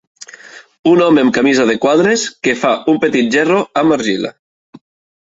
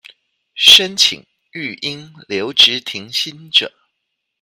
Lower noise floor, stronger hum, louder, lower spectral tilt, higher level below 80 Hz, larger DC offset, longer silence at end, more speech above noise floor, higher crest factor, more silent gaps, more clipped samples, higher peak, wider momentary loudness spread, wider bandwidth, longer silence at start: second, -38 dBFS vs -74 dBFS; neither; about the same, -13 LUFS vs -12 LUFS; first, -4.5 dB/octave vs -0.5 dB/octave; first, -56 dBFS vs -62 dBFS; neither; first, 0.9 s vs 0.75 s; second, 25 dB vs 59 dB; about the same, 14 dB vs 18 dB; first, 0.79-0.83 s vs none; second, under 0.1% vs 0.3%; about the same, 0 dBFS vs 0 dBFS; second, 8 LU vs 21 LU; second, 8 kHz vs over 20 kHz; about the same, 0.45 s vs 0.55 s